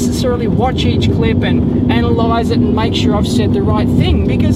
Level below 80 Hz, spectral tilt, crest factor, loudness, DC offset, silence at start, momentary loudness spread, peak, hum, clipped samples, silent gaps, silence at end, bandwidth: -26 dBFS; -7 dB/octave; 12 dB; -13 LUFS; under 0.1%; 0 s; 1 LU; 0 dBFS; none; under 0.1%; none; 0 s; 13.5 kHz